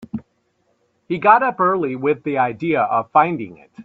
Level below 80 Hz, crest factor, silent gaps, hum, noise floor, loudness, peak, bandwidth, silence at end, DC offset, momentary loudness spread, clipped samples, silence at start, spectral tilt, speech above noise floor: -62 dBFS; 20 dB; none; none; -65 dBFS; -18 LUFS; 0 dBFS; 5.8 kHz; 0 s; under 0.1%; 15 LU; under 0.1%; 0 s; -9 dB/octave; 48 dB